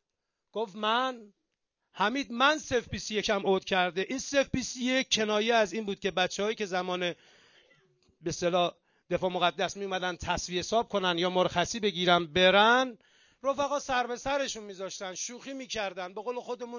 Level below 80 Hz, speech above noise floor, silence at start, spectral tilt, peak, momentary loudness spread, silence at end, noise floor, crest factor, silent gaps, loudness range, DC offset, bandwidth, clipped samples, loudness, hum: -58 dBFS; 55 dB; 0.55 s; -3.5 dB/octave; -10 dBFS; 12 LU; 0 s; -85 dBFS; 20 dB; none; 6 LU; under 0.1%; 7.4 kHz; under 0.1%; -29 LUFS; none